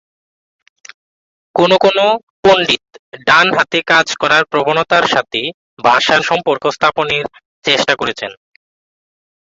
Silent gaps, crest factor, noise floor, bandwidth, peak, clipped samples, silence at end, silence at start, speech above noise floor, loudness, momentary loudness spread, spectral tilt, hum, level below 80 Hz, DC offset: 2.23-2.43 s, 2.99-3.12 s, 5.54-5.77 s, 7.45-7.62 s; 14 dB; under -90 dBFS; 8 kHz; 0 dBFS; under 0.1%; 1.2 s; 1.55 s; over 77 dB; -13 LUFS; 10 LU; -3 dB/octave; none; -54 dBFS; under 0.1%